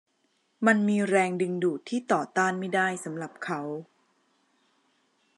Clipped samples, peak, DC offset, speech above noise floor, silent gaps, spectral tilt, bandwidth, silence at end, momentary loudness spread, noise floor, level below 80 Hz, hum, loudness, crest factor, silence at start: under 0.1%; -8 dBFS; under 0.1%; 45 dB; none; -5.5 dB/octave; 11.5 kHz; 1.55 s; 12 LU; -72 dBFS; -86 dBFS; none; -27 LUFS; 20 dB; 0.6 s